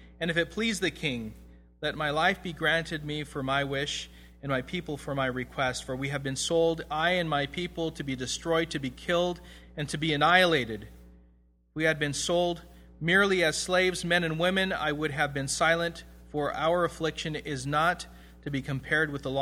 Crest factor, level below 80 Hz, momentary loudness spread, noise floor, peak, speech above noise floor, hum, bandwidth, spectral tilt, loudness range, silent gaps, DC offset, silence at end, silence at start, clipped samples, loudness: 24 dB; -52 dBFS; 10 LU; -62 dBFS; -6 dBFS; 33 dB; none; 16 kHz; -4 dB/octave; 4 LU; none; under 0.1%; 0 s; 0 s; under 0.1%; -28 LUFS